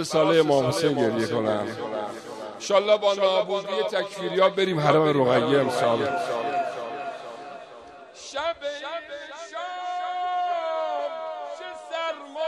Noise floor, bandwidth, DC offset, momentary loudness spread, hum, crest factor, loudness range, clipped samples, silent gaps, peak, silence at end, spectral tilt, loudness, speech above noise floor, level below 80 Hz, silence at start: -45 dBFS; 13 kHz; under 0.1%; 17 LU; none; 20 dB; 10 LU; under 0.1%; none; -4 dBFS; 0 s; -5 dB/octave; -25 LUFS; 23 dB; -68 dBFS; 0 s